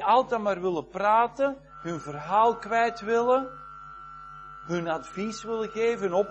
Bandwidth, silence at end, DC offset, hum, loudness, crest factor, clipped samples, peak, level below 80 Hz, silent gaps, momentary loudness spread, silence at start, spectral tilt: 8.4 kHz; 0 s; under 0.1%; none; -27 LUFS; 18 dB; under 0.1%; -8 dBFS; -60 dBFS; none; 20 LU; 0 s; -5.5 dB/octave